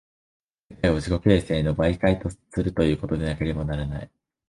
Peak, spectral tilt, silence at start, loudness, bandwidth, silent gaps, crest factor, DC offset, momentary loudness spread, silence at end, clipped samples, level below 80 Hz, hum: -4 dBFS; -7.5 dB/octave; 0.7 s; -24 LUFS; 11.5 kHz; none; 20 dB; under 0.1%; 9 LU; 0.45 s; under 0.1%; -36 dBFS; none